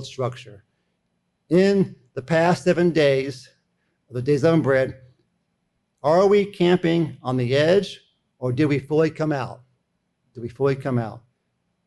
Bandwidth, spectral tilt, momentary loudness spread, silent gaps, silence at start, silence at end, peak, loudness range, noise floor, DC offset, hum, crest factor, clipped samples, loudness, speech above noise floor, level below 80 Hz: 11.5 kHz; -7 dB/octave; 16 LU; none; 0 s; 0.7 s; -8 dBFS; 4 LU; -73 dBFS; under 0.1%; none; 16 dB; under 0.1%; -21 LUFS; 52 dB; -58 dBFS